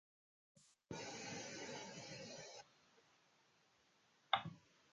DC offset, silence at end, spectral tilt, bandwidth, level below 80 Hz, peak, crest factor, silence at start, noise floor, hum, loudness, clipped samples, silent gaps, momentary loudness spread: under 0.1%; 0.3 s; -2.5 dB/octave; 10 kHz; -82 dBFS; -18 dBFS; 34 dB; 0.55 s; -76 dBFS; none; -48 LUFS; under 0.1%; none; 16 LU